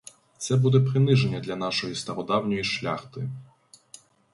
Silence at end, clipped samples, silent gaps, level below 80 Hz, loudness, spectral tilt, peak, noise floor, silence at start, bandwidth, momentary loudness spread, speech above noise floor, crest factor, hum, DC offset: 0.9 s; under 0.1%; none; -60 dBFS; -25 LUFS; -6 dB/octave; -8 dBFS; -53 dBFS; 0.4 s; 11.5 kHz; 14 LU; 28 dB; 18 dB; none; under 0.1%